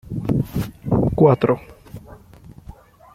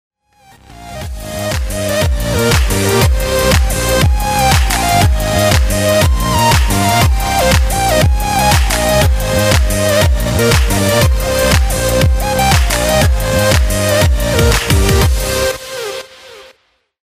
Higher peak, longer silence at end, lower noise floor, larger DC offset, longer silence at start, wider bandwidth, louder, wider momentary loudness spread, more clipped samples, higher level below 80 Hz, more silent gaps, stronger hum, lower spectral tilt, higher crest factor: about the same, -2 dBFS vs -2 dBFS; first, 1 s vs 0.65 s; second, -44 dBFS vs -56 dBFS; neither; second, 0.05 s vs 0.7 s; about the same, 16 kHz vs 16 kHz; second, -19 LUFS vs -12 LUFS; first, 25 LU vs 6 LU; neither; second, -40 dBFS vs -16 dBFS; neither; neither; first, -9 dB/octave vs -4 dB/octave; first, 20 dB vs 12 dB